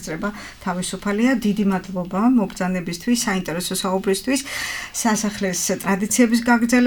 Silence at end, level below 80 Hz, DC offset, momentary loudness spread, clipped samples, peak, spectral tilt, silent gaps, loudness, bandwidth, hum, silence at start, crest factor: 0 s; -48 dBFS; under 0.1%; 8 LU; under 0.1%; -2 dBFS; -4 dB/octave; none; -21 LUFS; 19.5 kHz; none; 0 s; 18 dB